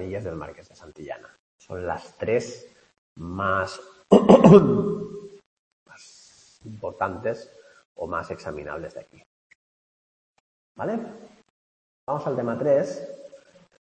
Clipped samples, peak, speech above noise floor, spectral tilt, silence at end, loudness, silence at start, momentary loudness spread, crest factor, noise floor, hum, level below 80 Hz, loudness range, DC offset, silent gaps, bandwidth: under 0.1%; 0 dBFS; 31 dB; -7.5 dB/octave; 0.6 s; -22 LUFS; 0 s; 26 LU; 24 dB; -54 dBFS; none; -56 dBFS; 18 LU; under 0.1%; 1.39-1.59 s, 2.98-3.16 s, 5.46-5.86 s, 7.85-7.95 s, 9.26-10.34 s, 10.40-10.75 s, 11.50-12.07 s; 8.8 kHz